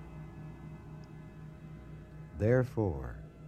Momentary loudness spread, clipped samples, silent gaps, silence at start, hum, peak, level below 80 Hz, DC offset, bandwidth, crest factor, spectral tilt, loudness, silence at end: 20 LU; under 0.1%; none; 0 s; none; -16 dBFS; -52 dBFS; under 0.1%; 12.5 kHz; 20 dB; -9.5 dB/octave; -32 LUFS; 0 s